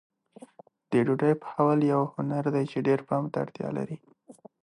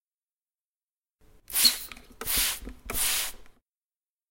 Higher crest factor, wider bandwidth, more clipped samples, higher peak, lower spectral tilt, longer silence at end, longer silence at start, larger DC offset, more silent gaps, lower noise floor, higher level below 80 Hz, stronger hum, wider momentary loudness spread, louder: second, 18 dB vs 26 dB; second, 11 kHz vs 16.5 kHz; neither; second, -10 dBFS vs -6 dBFS; first, -9 dB/octave vs 1 dB/octave; second, 0.3 s vs 0.8 s; second, 0.9 s vs 1.5 s; neither; neither; second, -53 dBFS vs under -90 dBFS; second, -72 dBFS vs -48 dBFS; neither; second, 9 LU vs 15 LU; about the same, -27 LUFS vs -25 LUFS